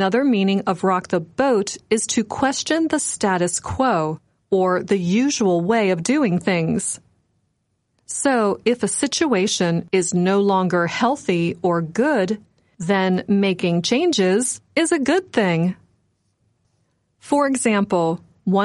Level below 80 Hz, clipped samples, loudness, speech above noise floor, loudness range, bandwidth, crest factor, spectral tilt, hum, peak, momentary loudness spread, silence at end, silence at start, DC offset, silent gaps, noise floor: -56 dBFS; under 0.1%; -20 LUFS; 51 dB; 3 LU; 11.5 kHz; 14 dB; -4.5 dB/octave; none; -6 dBFS; 5 LU; 0 s; 0 s; under 0.1%; none; -70 dBFS